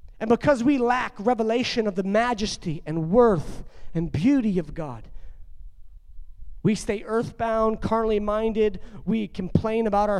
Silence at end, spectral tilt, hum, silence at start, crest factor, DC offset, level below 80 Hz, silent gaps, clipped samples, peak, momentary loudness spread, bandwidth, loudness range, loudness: 0 s; -6.5 dB/octave; none; 0.05 s; 20 dB; under 0.1%; -42 dBFS; none; under 0.1%; -4 dBFS; 10 LU; 11.5 kHz; 6 LU; -24 LUFS